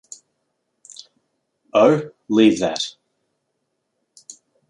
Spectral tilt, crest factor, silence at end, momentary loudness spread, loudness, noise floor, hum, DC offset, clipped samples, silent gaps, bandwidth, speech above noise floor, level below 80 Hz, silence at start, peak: -5 dB/octave; 22 dB; 1.8 s; 25 LU; -18 LUFS; -74 dBFS; none; under 0.1%; under 0.1%; none; 11 kHz; 58 dB; -64 dBFS; 1.75 s; -2 dBFS